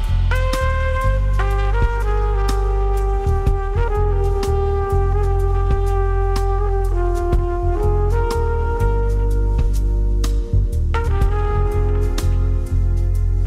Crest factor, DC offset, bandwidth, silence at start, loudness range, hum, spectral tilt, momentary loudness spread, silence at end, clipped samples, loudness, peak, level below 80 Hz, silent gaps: 12 dB; under 0.1%; 11.5 kHz; 0 s; 0 LU; none; -7 dB/octave; 1 LU; 0 s; under 0.1%; -20 LUFS; -4 dBFS; -18 dBFS; none